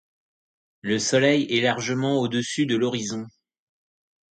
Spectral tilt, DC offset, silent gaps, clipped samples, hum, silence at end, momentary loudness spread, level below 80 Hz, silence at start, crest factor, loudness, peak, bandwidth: -4 dB/octave; under 0.1%; none; under 0.1%; none; 1.05 s; 13 LU; -66 dBFS; 0.85 s; 20 dB; -23 LUFS; -6 dBFS; 9.2 kHz